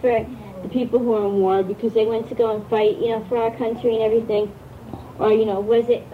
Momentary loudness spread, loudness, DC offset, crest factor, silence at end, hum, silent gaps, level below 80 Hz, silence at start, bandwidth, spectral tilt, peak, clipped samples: 12 LU; -21 LUFS; under 0.1%; 14 dB; 0 s; none; none; -52 dBFS; 0 s; 5.4 kHz; -7.5 dB/octave; -6 dBFS; under 0.1%